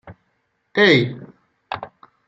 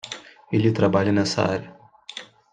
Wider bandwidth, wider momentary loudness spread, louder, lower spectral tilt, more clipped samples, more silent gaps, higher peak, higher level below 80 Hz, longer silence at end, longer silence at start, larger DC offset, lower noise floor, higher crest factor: second, 7.6 kHz vs 9.6 kHz; first, 23 LU vs 18 LU; first, -16 LUFS vs -22 LUFS; about the same, -6 dB/octave vs -6 dB/octave; neither; neither; first, -2 dBFS vs -6 dBFS; about the same, -62 dBFS vs -60 dBFS; about the same, 0.4 s vs 0.3 s; about the same, 0.05 s vs 0.05 s; neither; first, -69 dBFS vs -41 dBFS; about the same, 20 dB vs 18 dB